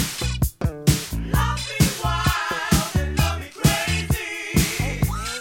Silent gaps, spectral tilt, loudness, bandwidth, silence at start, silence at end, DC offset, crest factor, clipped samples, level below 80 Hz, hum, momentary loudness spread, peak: none; -4.5 dB/octave; -22 LUFS; 17 kHz; 0 s; 0 s; under 0.1%; 20 dB; under 0.1%; -30 dBFS; none; 4 LU; -2 dBFS